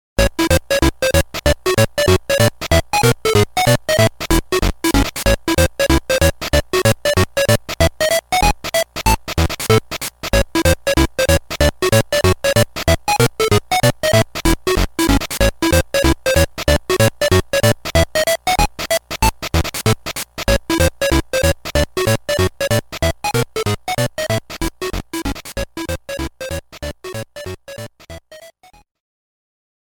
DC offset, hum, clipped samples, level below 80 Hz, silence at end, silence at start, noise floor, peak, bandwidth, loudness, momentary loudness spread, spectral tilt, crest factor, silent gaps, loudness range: under 0.1%; none; under 0.1%; -26 dBFS; 1.5 s; 0.2 s; -44 dBFS; 0 dBFS; 19 kHz; -17 LUFS; 10 LU; -4.5 dB/octave; 16 dB; none; 9 LU